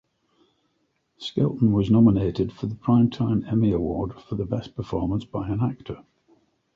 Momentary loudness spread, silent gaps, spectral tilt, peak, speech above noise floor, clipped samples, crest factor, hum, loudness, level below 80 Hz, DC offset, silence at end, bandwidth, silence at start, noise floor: 13 LU; none; -9.5 dB/octave; -6 dBFS; 49 dB; under 0.1%; 18 dB; none; -24 LUFS; -46 dBFS; under 0.1%; 0.75 s; 7.2 kHz; 1.2 s; -71 dBFS